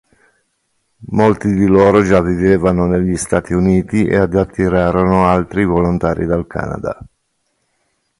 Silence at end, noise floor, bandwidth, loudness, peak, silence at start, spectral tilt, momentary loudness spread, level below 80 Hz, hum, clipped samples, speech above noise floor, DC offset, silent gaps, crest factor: 1.15 s; -66 dBFS; 11.5 kHz; -14 LUFS; 0 dBFS; 1 s; -7.5 dB/octave; 10 LU; -34 dBFS; none; under 0.1%; 53 dB; under 0.1%; none; 14 dB